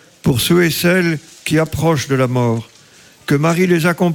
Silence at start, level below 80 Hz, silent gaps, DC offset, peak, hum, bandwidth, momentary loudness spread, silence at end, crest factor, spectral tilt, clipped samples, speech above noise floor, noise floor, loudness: 0.25 s; -44 dBFS; none; under 0.1%; -2 dBFS; none; 17.5 kHz; 6 LU; 0 s; 12 dB; -5.5 dB/octave; under 0.1%; 31 dB; -45 dBFS; -15 LUFS